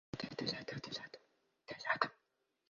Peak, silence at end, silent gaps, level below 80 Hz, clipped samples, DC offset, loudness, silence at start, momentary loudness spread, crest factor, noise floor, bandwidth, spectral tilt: -16 dBFS; 0.55 s; none; -76 dBFS; under 0.1%; under 0.1%; -41 LUFS; 0.15 s; 18 LU; 30 dB; -84 dBFS; 7.4 kHz; -2 dB/octave